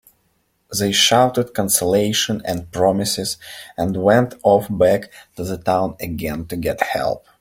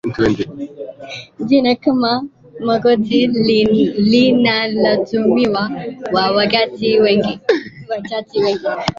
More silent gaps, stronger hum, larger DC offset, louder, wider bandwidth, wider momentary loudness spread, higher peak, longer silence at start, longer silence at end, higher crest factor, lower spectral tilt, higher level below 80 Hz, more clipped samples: neither; neither; neither; second, -18 LUFS vs -15 LUFS; first, 16.5 kHz vs 7.6 kHz; about the same, 11 LU vs 13 LU; about the same, 0 dBFS vs 0 dBFS; first, 0.7 s vs 0.05 s; first, 0.2 s vs 0.05 s; about the same, 18 dB vs 14 dB; second, -3.5 dB/octave vs -6.5 dB/octave; about the same, -48 dBFS vs -48 dBFS; neither